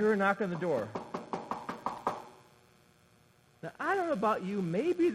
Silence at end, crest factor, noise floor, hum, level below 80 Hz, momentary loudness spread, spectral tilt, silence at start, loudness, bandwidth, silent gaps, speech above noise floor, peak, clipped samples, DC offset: 0 s; 20 dB; -64 dBFS; none; -72 dBFS; 13 LU; -7 dB/octave; 0 s; -33 LUFS; 14 kHz; none; 34 dB; -14 dBFS; under 0.1%; under 0.1%